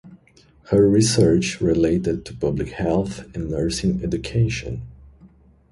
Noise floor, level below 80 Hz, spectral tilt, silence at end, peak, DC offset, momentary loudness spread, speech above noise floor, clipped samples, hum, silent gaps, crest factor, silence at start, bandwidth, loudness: -54 dBFS; -38 dBFS; -6 dB/octave; 0.45 s; -4 dBFS; under 0.1%; 12 LU; 34 dB; under 0.1%; none; none; 18 dB; 0.05 s; 11.5 kHz; -21 LUFS